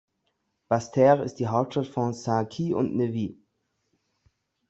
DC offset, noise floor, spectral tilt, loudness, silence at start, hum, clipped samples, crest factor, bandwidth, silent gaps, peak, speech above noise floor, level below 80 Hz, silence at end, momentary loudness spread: under 0.1%; -76 dBFS; -7.5 dB/octave; -26 LUFS; 0.7 s; none; under 0.1%; 20 dB; 8.2 kHz; none; -6 dBFS; 51 dB; -66 dBFS; 1.35 s; 9 LU